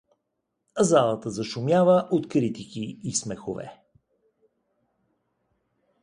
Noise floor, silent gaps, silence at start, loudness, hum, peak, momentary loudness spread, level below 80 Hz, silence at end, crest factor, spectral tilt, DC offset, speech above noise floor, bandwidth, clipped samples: -79 dBFS; none; 0.75 s; -24 LUFS; none; -6 dBFS; 15 LU; -64 dBFS; 2.3 s; 22 dB; -5.5 dB/octave; under 0.1%; 55 dB; 11.5 kHz; under 0.1%